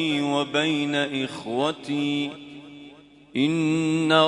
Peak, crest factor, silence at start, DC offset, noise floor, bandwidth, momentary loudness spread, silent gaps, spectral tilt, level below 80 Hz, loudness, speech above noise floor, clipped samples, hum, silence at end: -4 dBFS; 20 dB; 0 s; under 0.1%; -49 dBFS; 11 kHz; 19 LU; none; -5 dB/octave; -68 dBFS; -24 LUFS; 25 dB; under 0.1%; none; 0 s